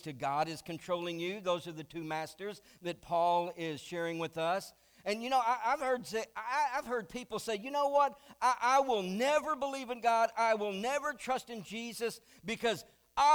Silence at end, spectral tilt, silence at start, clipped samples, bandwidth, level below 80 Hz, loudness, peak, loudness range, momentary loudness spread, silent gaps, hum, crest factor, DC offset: 0 s; -4 dB/octave; 0.05 s; under 0.1%; over 20 kHz; -70 dBFS; -34 LUFS; -16 dBFS; 5 LU; 12 LU; none; none; 18 dB; under 0.1%